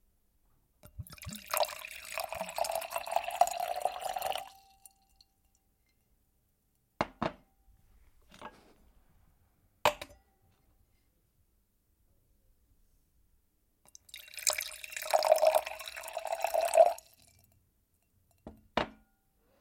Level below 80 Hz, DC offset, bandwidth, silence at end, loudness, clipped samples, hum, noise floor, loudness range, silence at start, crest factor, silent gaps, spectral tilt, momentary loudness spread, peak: -66 dBFS; under 0.1%; 17 kHz; 0.65 s; -32 LUFS; under 0.1%; none; -75 dBFS; 14 LU; 0.95 s; 28 dB; none; -2 dB/octave; 23 LU; -8 dBFS